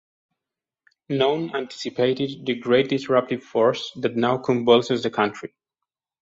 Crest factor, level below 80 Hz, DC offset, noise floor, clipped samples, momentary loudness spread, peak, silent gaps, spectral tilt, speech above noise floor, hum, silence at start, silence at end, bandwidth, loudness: 20 dB; -64 dBFS; under 0.1%; -88 dBFS; under 0.1%; 11 LU; -4 dBFS; none; -6 dB/octave; 66 dB; none; 1.1 s; 0.75 s; 7.8 kHz; -22 LUFS